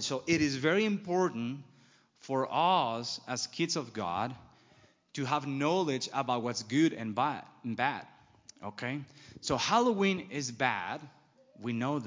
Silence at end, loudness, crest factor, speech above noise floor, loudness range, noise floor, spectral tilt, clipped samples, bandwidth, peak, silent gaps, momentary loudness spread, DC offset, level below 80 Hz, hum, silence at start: 0 s; -32 LUFS; 20 dB; 32 dB; 2 LU; -64 dBFS; -4.5 dB/octave; under 0.1%; 7.8 kHz; -12 dBFS; none; 13 LU; under 0.1%; -68 dBFS; none; 0 s